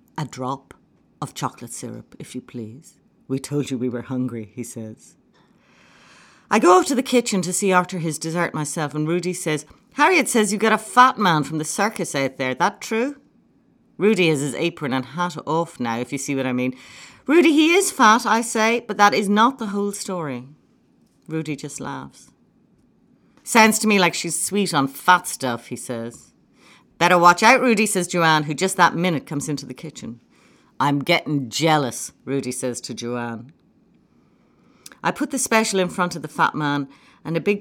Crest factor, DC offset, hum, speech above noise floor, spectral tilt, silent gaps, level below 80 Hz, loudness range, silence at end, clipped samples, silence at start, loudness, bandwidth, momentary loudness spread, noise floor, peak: 20 dB; under 0.1%; none; 38 dB; -4 dB/octave; none; -66 dBFS; 12 LU; 0 s; under 0.1%; 0.15 s; -20 LUFS; 18.5 kHz; 18 LU; -59 dBFS; -2 dBFS